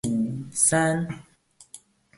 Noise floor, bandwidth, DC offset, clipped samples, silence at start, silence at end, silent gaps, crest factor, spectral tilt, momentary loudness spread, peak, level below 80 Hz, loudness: -51 dBFS; 12 kHz; under 0.1%; under 0.1%; 0.05 s; 0.4 s; none; 20 dB; -4.5 dB/octave; 14 LU; -6 dBFS; -58 dBFS; -23 LUFS